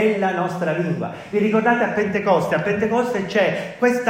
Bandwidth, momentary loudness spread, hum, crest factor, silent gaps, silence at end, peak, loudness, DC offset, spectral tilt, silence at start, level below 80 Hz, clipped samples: 16 kHz; 5 LU; none; 16 dB; none; 0 s; -4 dBFS; -20 LUFS; under 0.1%; -6.5 dB/octave; 0 s; -58 dBFS; under 0.1%